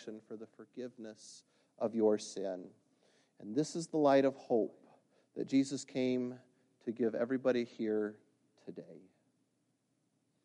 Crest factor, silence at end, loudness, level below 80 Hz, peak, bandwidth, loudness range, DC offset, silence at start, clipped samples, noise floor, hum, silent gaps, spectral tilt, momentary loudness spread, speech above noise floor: 20 dB; 1.45 s; -35 LUFS; -88 dBFS; -16 dBFS; 11 kHz; 5 LU; under 0.1%; 0 s; under 0.1%; -79 dBFS; none; none; -5.5 dB/octave; 20 LU; 44 dB